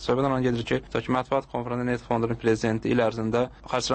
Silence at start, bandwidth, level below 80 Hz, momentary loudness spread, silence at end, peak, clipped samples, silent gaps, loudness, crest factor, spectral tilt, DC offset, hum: 0 s; 8.8 kHz; -48 dBFS; 4 LU; 0 s; -10 dBFS; under 0.1%; none; -26 LUFS; 16 dB; -6 dB/octave; under 0.1%; none